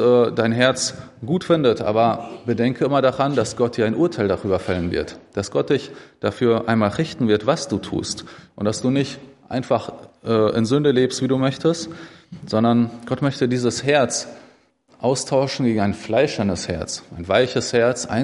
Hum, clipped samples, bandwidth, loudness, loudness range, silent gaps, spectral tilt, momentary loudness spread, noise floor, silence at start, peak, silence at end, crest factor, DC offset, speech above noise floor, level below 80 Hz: none; under 0.1%; 11.5 kHz; -20 LUFS; 3 LU; none; -5.5 dB/octave; 11 LU; -55 dBFS; 0 s; -2 dBFS; 0 s; 18 dB; under 0.1%; 35 dB; -54 dBFS